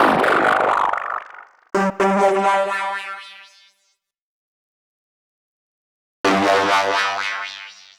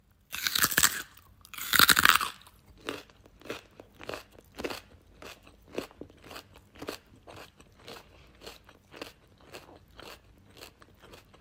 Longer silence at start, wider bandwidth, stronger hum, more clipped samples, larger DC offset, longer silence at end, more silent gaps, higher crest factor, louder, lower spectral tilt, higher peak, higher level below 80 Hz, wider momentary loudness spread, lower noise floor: second, 0 s vs 0.3 s; first, over 20 kHz vs 17 kHz; neither; neither; neither; about the same, 0.25 s vs 0.25 s; first, 4.21-6.24 s vs none; second, 18 dB vs 32 dB; first, -18 LUFS vs -25 LUFS; first, -4 dB/octave vs -0.5 dB/octave; about the same, -4 dBFS vs -2 dBFS; about the same, -60 dBFS vs -60 dBFS; second, 15 LU vs 28 LU; first, -68 dBFS vs -56 dBFS